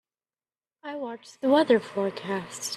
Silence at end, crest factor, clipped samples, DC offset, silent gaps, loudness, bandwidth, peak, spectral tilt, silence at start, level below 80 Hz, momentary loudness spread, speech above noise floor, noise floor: 0 s; 20 dB; under 0.1%; under 0.1%; none; -26 LUFS; 13 kHz; -8 dBFS; -4 dB/octave; 0.85 s; -76 dBFS; 17 LU; over 64 dB; under -90 dBFS